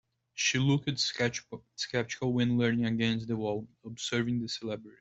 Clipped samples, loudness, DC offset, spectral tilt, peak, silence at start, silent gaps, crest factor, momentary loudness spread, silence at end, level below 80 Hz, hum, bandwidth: under 0.1%; -31 LUFS; under 0.1%; -4.5 dB/octave; -14 dBFS; 0.35 s; none; 18 dB; 11 LU; 0.1 s; -64 dBFS; none; 8.2 kHz